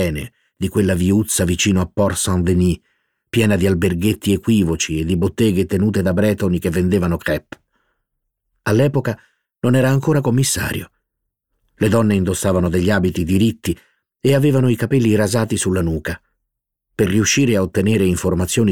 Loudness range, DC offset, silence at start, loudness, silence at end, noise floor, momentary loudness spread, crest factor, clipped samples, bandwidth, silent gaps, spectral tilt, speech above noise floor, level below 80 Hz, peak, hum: 3 LU; under 0.1%; 0 s; -17 LUFS; 0 s; -77 dBFS; 9 LU; 14 dB; under 0.1%; 18 kHz; none; -5.5 dB/octave; 61 dB; -40 dBFS; -2 dBFS; none